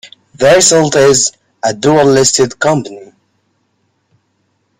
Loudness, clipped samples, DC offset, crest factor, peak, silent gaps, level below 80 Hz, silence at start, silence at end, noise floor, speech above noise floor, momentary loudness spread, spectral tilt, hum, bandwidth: -10 LUFS; under 0.1%; under 0.1%; 12 dB; 0 dBFS; none; -48 dBFS; 0.05 s; 1.75 s; -61 dBFS; 52 dB; 11 LU; -3 dB/octave; none; 16.5 kHz